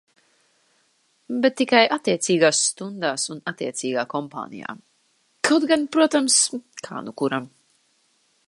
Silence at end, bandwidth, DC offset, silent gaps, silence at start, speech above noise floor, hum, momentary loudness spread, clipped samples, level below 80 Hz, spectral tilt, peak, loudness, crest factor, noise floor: 1 s; 11.5 kHz; under 0.1%; none; 1.3 s; 44 dB; none; 17 LU; under 0.1%; -74 dBFS; -2.5 dB/octave; -2 dBFS; -21 LUFS; 22 dB; -65 dBFS